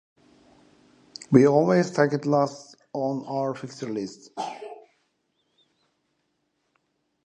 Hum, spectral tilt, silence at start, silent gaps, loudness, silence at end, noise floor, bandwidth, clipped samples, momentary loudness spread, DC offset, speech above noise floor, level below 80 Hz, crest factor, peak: none; -7 dB/octave; 1.3 s; none; -24 LUFS; 2.5 s; -74 dBFS; 9.6 kHz; under 0.1%; 23 LU; under 0.1%; 51 dB; -70 dBFS; 26 dB; -2 dBFS